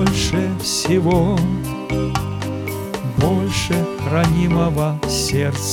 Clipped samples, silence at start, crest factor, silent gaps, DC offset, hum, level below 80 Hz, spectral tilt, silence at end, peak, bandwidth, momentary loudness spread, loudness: under 0.1%; 0 s; 16 dB; none; under 0.1%; none; -34 dBFS; -5.5 dB/octave; 0 s; -2 dBFS; 18 kHz; 8 LU; -19 LUFS